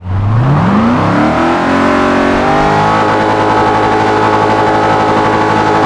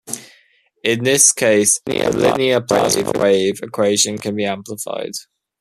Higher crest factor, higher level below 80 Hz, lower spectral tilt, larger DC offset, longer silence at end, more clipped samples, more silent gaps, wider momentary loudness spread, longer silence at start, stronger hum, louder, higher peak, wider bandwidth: second, 10 dB vs 18 dB; first, -32 dBFS vs -54 dBFS; first, -6.5 dB/octave vs -2.5 dB/octave; neither; second, 0 s vs 0.4 s; neither; neither; second, 1 LU vs 15 LU; about the same, 0 s vs 0.05 s; neither; first, -10 LUFS vs -16 LUFS; about the same, 0 dBFS vs 0 dBFS; second, 11 kHz vs 15 kHz